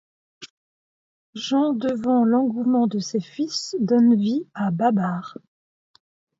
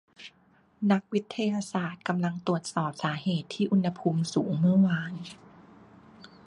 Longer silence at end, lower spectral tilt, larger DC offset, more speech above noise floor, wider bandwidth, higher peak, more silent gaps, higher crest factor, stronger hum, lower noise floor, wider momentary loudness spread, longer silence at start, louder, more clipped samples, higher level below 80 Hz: first, 1.05 s vs 0.2 s; about the same, -6 dB/octave vs -6.5 dB/octave; neither; first, over 69 dB vs 35 dB; second, 7.8 kHz vs 11 kHz; about the same, -8 dBFS vs -10 dBFS; first, 0.50-1.33 s vs none; about the same, 16 dB vs 18 dB; neither; first, under -90 dBFS vs -63 dBFS; second, 10 LU vs 14 LU; first, 0.4 s vs 0.2 s; first, -22 LUFS vs -28 LUFS; neither; about the same, -68 dBFS vs -68 dBFS